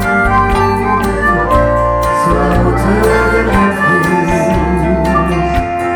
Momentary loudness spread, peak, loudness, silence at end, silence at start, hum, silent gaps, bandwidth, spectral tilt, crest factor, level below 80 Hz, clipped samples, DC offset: 2 LU; 0 dBFS; -12 LUFS; 0 s; 0 s; none; none; over 20 kHz; -6.5 dB/octave; 10 dB; -20 dBFS; under 0.1%; under 0.1%